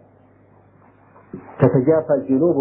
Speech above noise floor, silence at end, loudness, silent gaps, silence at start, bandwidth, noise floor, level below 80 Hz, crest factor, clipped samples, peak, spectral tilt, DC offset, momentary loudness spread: 35 dB; 0 s; -17 LUFS; none; 1.35 s; 3.1 kHz; -52 dBFS; -58 dBFS; 20 dB; under 0.1%; 0 dBFS; -14.5 dB/octave; under 0.1%; 23 LU